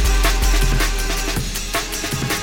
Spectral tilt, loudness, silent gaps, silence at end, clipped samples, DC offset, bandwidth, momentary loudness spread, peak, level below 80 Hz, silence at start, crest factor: -3 dB/octave; -20 LUFS; none; 0 s; under 0.1%; under 0.1%; 17 kHz; 4 LU; -4 dBFS; -20 dBFS; 0 s; 14 dB